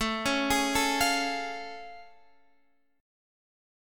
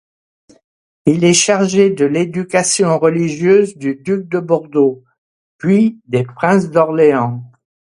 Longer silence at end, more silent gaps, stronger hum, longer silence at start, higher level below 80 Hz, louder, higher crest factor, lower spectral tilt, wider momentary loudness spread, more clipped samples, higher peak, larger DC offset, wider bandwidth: first, 1 s vs 0.5 s; second, none vs 5.18-5.59 s; neither; second, 0 s vs 1.05 s; first, -52 dBFS vs -58 dBFS; second, -27 LUFS vs -14 LUFS; about the same, 18 dB vs 14 dB; second, -2 dB/octave vs -5 dB/octave; first, 17 LU vs 8 LU; neither; second, -14 dBFS vs 0 dBFS; neither; first, 17.5 kHz vs 11 kHz